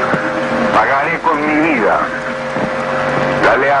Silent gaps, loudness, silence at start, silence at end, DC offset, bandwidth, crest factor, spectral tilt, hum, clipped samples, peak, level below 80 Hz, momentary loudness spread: none; -14 LUFS; 0 s; 0 s; under 0.1%; 11 kHz; 12 dB; -5.5 dB/octave; none; under 0.1%; -2 dBFS; -44 dBFS; 7 LU